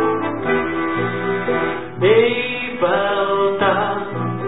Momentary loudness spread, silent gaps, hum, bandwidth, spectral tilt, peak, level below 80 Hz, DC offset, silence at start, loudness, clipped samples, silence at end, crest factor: 7 LU; none; none; 4 kHz; -11 dB/octave; -2 dBFS; -50 dBFS; 1%; 0 s; -18 LUFS; under 0.1%; 0 s; 16 dB